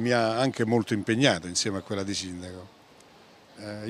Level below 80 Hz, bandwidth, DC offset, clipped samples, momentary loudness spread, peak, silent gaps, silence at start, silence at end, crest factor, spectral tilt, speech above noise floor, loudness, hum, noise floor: -68 dBFS; 14 kHz; under 0.1%; under 0.1%; 17 LU; -4 dBFS; none; 0 s; 0 s; 24 dB; -4.5 dB/octave; 27 dB; -26 LUFS; none; -54 dBFS